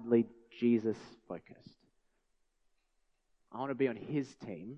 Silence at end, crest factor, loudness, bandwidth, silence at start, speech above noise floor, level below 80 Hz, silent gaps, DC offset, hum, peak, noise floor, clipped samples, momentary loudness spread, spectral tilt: 0 s; 22 dB; -35 LUFS; 7.6 kHz; 0 s; 41 dB; -78 dBFS; none; under 0.1%; none; -16 dBFS; -77 dBFS; under 0.1%; 17 LU; -8 dB/octave